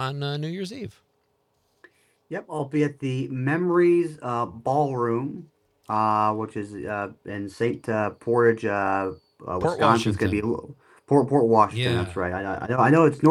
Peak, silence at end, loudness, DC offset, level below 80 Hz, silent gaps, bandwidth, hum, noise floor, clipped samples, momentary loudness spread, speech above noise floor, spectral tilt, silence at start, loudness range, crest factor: -4 dBFS; 0 s; -24 LUFS; under 0.1%; -60 dBFS; none; 12 kHz; none; -70 dBFS; under 0.1%; 14 LU; 46 dB; -7 dB/octave; 0 s; 5 LU; 20 dB